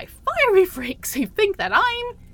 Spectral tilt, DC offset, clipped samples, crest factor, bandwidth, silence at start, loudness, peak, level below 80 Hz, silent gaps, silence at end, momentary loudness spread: -3 dB/octave; under 0.1%; under 0.1%; 16 dB; 17.5 kHz; 0 s; -20 LUFS; -4 dBFS; -46 dBFS; none; 0.1 s; 10 LU